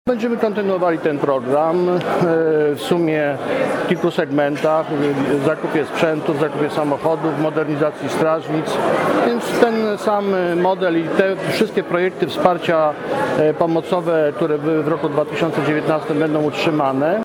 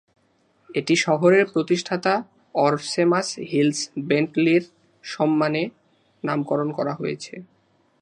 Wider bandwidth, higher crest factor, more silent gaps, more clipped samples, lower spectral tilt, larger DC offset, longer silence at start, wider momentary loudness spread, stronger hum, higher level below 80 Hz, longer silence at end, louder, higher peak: first, 17.5 kHz vs 10.5 kHz; about the same, 18 dB vs 18 dB; neither; neither; first, -6.5 dB/octave vs -5 dB/octave; neither; second, 0.05 s vs 0.7 s; second, 3 LU vs 12 LU; neither; first, -60 dBFS vs -72 dBFS; second, 0 s vs 0.55 s; first, -18 LUFS vs -22 LUFS; first, 0 dBFS vs -4 dBFS